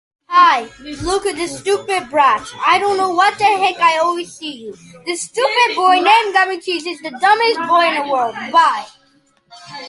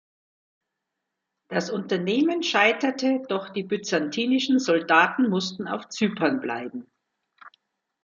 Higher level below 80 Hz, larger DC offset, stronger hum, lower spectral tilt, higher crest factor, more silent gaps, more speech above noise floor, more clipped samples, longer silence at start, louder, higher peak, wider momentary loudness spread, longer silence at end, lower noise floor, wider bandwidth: first, -50 dBFS vs -74 dBFS; neither; neither; second, -2 dB/octave vs -4.5 dB/octave; second, 16 dB vs 22 dB; neither; second, 40 dB vs 59 dB; neither; second, 0.3 s vs 1.5 s; first, -15 LUFS vs -24 LUFS; about the same, 0 dBFS vs -2 dBFS; first, 14 LU vs 11 LU; second, 0 s vs 0.55 s; second, -56 dBFS vs -83 dBFS; first, 11.5 kHz vs 7.4 kHz